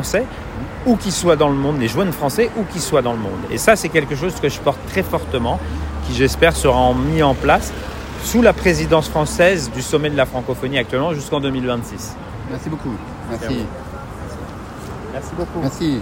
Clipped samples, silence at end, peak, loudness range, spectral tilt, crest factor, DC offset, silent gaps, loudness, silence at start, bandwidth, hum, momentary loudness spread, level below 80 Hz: under 0.1%; 0 s; 0 dBFS; 10 LU; -5 dB/octave; 18 dB; under 0.1%; none; -18 LUFS; 0 s; 16.5 kHz; none; 15 LU; -32 dBFS